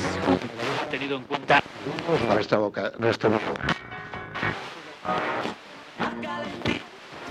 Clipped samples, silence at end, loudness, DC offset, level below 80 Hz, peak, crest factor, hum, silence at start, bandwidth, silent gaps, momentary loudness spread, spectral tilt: under 0.1%; 0 s; -27 LUFS; under 0.1%; -56 dBFS; -6 dBFS; 20 dB; none; 0 s; 13.5 kHz; none; 13 LU; -5.5 dB/octave